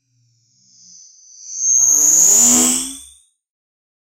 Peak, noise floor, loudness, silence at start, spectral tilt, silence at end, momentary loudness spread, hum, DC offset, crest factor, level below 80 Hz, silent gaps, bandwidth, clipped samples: 0 dBFS; -60 dBFS; -10 LUFS; 1.45 s; 0 dB/octave; 1.05 s; 15 LU; none; under 0.1%; 18 dB; -56 dBFS; none; 16 kHz; under 0.1%